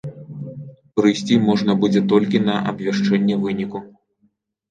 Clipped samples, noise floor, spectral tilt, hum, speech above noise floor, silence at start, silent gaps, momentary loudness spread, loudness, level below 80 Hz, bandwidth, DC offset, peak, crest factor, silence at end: under 0.1%; -64 dBFS; -6.5 dB/octave; none; 47 dB; 0.05 s; none; 17 LU; -19 LUFS; -60 dBFS; 8.8 kHz; under 0.1%; -2 dBFS; 16 dB; 0.85 s